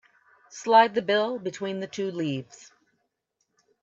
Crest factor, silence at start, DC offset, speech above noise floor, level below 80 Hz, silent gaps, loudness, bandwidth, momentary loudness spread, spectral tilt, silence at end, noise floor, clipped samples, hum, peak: 22 dB; 0.55 s; under 0.1%; 52 dB; -78 dBFS; none; -25 LUFS; 7.8 kHz; 16 LU; -4.5 dB/octave; 1.4 s; -77 dBFS; under 0.1%; none; -6 dBFS